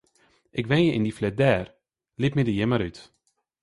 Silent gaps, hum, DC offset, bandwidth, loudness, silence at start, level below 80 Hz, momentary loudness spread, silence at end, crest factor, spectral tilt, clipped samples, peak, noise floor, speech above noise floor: none; none; under 0.1%; 11.5 kHz; -25 LUFS; 0.55 s; -52 dBFS; 12 LU; 0.6 s; 20 dB; -7.5 dB/octave; under 0.1%; -6 dBFS; -64 dBFS; 40 dB